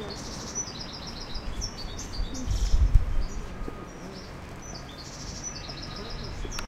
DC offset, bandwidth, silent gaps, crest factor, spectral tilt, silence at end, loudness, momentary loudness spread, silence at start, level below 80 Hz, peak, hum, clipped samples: under 0.1%; 13 kHz; none; 26 dB; -4 dB/octave; 0 s; -34 LUFS; 13 LU; 0 s; -30 dBFS; -4 dBFS; none; under 0.1%